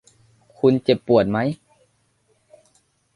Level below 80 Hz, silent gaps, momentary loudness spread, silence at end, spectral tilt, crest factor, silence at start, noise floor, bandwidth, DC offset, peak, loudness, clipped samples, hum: -56 dBFS; none; 9 LU; 1.6 s; -8 dB/octave; 20 dB; 0.65 s; -65 dBFS; 11 kHz; under 0.1%; -2 dBFS; -19 LUFS; under 0.1%; none